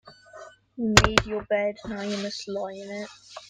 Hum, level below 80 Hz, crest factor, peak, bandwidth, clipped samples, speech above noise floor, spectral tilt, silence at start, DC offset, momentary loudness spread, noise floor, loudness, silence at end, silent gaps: none; -40 dBFS; 28 dB; 0 dBFS; 16.5 kHz; under 0.1%; 22 dB; -3.5 dB/octave; 0.05 s; under 0.1%; 22 LU; -47 dBFS; -25 LUFS; 0.05 s; none